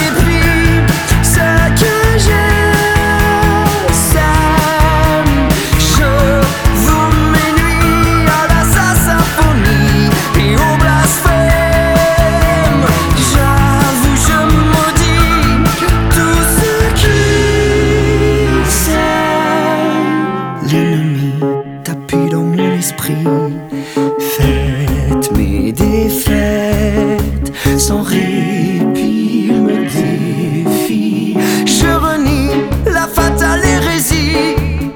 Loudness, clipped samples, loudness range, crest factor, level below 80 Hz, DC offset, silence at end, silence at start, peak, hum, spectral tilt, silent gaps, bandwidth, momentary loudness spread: -11 LUFS; under 0.1%; 4 LU; 10 dB; -18 dBFS; 0.6%; 0 s; 0 s; 0 dBFS; none; -5 dB/octave; none; over 20 kHz; 5 LU